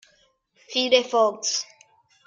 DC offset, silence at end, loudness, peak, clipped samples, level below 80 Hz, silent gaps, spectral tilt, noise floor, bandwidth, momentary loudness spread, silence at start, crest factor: under 0.1%; 0.65 s; -22 LUFS; -6 dBFS; under 0.1%; -76 dBFS; none; -0.5 dB/octave; -63 dBFS; 7.6 kHz; 9 LU; 0.7 s; 20 dB